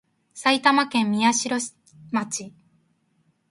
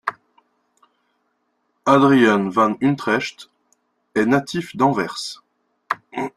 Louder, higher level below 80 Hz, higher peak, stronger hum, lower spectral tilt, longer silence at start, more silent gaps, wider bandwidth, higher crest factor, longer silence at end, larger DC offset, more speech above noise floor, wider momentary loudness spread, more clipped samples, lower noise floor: second, -22 LUFS vs -19 LUFS; second, -72 dBFS vs -62 dBFS; about the same, -4 dBFS vs -2 dBFS; neither; second, -2.5 dB/octave vs -6 dB/octave; first, 0.35 s vs 0.05 s; neither; about the same, 11.5 kHz vs 12.5 kHz; about the same, 20 dB vs 20 dB; first, 1 s vs 0.1 s; neither; second, 45 dB vs 52 dB; second, 13 LU vs 16 LU; neither; about the same, -67 dBFS vs -70 dBFS